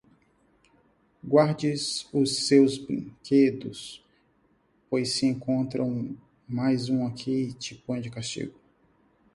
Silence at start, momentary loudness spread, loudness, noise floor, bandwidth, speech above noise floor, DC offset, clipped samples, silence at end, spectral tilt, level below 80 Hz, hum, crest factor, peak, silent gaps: 1.25 s; 16 LU; -26 LUFS; -66 dBFS; 11.5 kHz; 41 dB; under 0.1%; under 0.1%; 0.85 s; -5.5 dB/octave; -64 dBFS; none; 20 dB; -6 dBFS; none